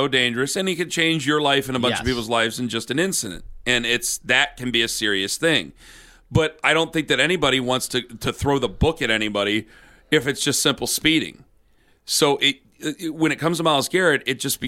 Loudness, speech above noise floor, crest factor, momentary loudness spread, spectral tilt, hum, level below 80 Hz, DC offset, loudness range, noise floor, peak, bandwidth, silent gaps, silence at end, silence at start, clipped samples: -20 LUFS; 36 dB; 20 dB; 6 LU; -3 dB/octave; none; -42 dBFS; under 0.1%; 1 LU; -58 dBFS; -2 dBFS; 16.5 kHz; none; 0 s; 0 s; under 0.1%